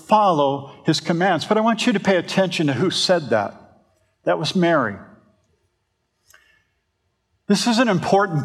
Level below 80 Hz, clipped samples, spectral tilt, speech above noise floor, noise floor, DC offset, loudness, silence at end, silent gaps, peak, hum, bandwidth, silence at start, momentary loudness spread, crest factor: -68 dBFS; under 0.1%; -5 dB/octave; 53 dB; -72 dBFS; under 0.1%; -19 LUFS; 0 s; none; -2 dBFS; none; 14 kHz; 0.1 s; 6 LU; 18 dB